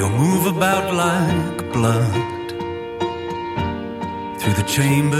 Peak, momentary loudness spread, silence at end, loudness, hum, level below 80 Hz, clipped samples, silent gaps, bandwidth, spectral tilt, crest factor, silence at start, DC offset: -4 dBFS; 10 LU; 0 s; -20 LUFS; none; -46 dBFS; under 0.1%; none; 16.5 kHz; -5.5 dB/octave; 16 dB; 0 s; under 0.1%